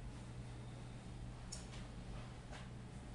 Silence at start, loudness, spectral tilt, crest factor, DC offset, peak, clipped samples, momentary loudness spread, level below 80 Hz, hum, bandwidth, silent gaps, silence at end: 0 s; -52 LUFS; -5 dB/octave; 18 dB; under 0.1%; -32 dBFS; under 0.1%; 2 LU; -56 dBFS; none; 11 kHz; none; 0 s